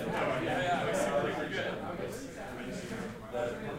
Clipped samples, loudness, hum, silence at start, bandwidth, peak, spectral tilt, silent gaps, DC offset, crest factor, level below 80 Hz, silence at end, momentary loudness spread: under 0.1%; -35 LUFS; none; 0 s; 16 kHz; -20 dBFS; -5 dB/octave; none; under 0.1%; 14 dB; -56 dBFS; 0 s; 10 LU